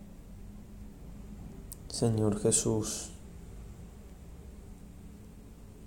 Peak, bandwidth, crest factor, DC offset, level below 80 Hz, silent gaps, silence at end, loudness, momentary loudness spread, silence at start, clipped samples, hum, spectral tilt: -12 dBFS; 17 kHz; 24 dB; under 0.1%; -50 dBFS; none; 0 s; -30 LUFS; 23 LU; 0 s; under 0.1%; none; -5 dB/octave